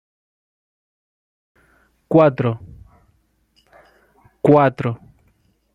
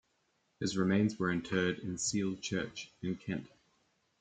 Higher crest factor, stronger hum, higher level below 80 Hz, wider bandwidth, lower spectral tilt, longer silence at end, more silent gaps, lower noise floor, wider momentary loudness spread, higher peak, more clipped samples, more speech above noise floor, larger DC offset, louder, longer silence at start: about the same, 20 dB vs 18 dB; neither; first, -56 dBFS vs -68 dBFS; about the same, 9.8 kHz vs 9.4 kHz; first, -9.5 dB/octave vs -4.5 dB/octave; about the same, 0.8 s vs 0.75 s; neither; second, -62 dBFS vs -77 dBFS; first, 15 LU vs 10 LU; first, -2 dBFS vs -18 dBFS; neither; first, 47 dB vs 43 dB; neither; first, -17 LUFS vs -35 LUFS; first, 2.1 s vs 0.6 s